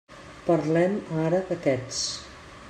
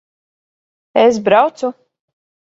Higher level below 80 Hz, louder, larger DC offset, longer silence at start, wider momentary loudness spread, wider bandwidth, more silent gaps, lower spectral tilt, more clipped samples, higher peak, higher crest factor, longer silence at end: about the same, -56 dBFS vs -60 dBFS; second, -26 LUFS vs -14 LUFS; neither; second, 0.1 s vs 0.95 s; about the same, 13 LU vs 12 LU; first, 10.5 kHz vs 7.8 kHz; neither; about the same, -5 dB/octave vs -5 dB/octave; neither; second, -10 dBFS vs 0 dBFS; about the same, 16 dB vs 18 dB; second, 0 s vs 0.8 s